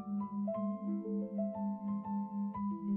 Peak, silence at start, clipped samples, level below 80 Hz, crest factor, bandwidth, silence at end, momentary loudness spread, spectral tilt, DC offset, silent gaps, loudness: -26 dBFS; 0 s; under 0.1%; -74 dBFS; 10 dB; 2.2 kHz; 0 s; 2 LU; -12.5 dB/octave; under 0.1%; none; -38 LUFS